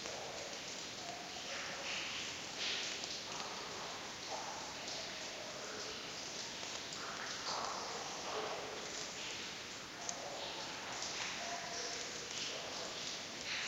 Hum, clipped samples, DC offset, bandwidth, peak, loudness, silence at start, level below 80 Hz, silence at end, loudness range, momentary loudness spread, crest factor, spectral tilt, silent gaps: none; under 0.1%; under 0.1%; 16 kHz; -22 dBFS; -42 LUFS; 0 s; -72 dBFS; 0 s; 2 LU; 4 LU; 24 dB; -1 dB/octave; none